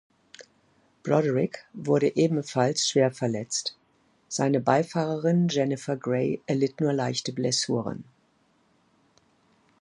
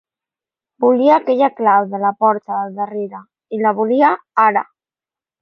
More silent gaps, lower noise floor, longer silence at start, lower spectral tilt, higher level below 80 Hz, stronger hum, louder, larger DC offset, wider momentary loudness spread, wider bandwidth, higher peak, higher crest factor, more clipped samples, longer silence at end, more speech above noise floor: neither; second, -66 dBFS vs under -90 dBFS; second, 0.4 s vs 0.8 s; second, -5 dB/octave vs -8 dB/octave; about the same, -70 dBFS vs -74 dBFS; neither; second, -26 LUFS vs -16 LUFS; neither; second, 7 LU vs 10 LU; first, 11.5 kHz vs 6 kHz; about the same, -4 dBFS vs -2 dBFS; first, 22 dB vs 14 dB; neither; first, 1.8 s vs 0.8 s; second, 41 dB vs over 75 dB